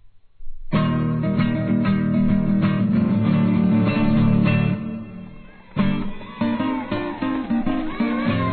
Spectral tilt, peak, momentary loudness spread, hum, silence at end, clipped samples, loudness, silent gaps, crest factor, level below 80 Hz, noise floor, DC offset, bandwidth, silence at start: -11.5 dB/octave; -8 dBFS; 9 LU; none; 0 s; under 0.1%; -21 LUFS; none; 12 dB; -38 dBFS; -41 dBFS; 0.3%; 4.5 kHz; 0.05 s